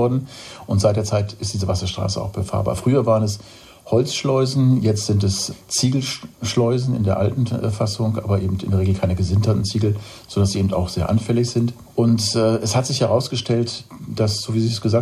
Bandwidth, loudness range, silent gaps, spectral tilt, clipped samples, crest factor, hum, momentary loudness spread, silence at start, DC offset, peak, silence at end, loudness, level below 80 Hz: 13 kHz; 2 LU; none; -6 dB/octave; under 0.1%; 16 dB; none; 7 LU; 0 s; under 0.1%; -4 dBFS; 0 s; -20 LUFS; -44 dBFS